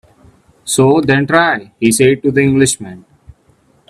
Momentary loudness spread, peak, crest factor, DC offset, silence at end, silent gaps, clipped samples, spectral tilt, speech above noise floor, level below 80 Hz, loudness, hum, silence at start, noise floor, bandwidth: 9 LU; 0 dBFS; 14 dB; under 0.1%; 0.9 s; none; under 0.1%; -4.5 dB/octave; 41 dB; -48 dBFS; -12 LUFS; none; 0.65 s; -53 dBFS; 14.5 kHz